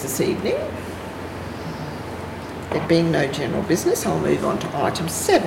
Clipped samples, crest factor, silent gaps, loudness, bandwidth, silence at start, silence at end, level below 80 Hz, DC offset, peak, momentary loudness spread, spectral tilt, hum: under 0.1%; 18 dB; none; -23 LUFS; 16.5 kHz; 0 s; 0 s; -48 dBFS; under 0.1%; -6 dBFS; 13 LU; -5 dB/octave; none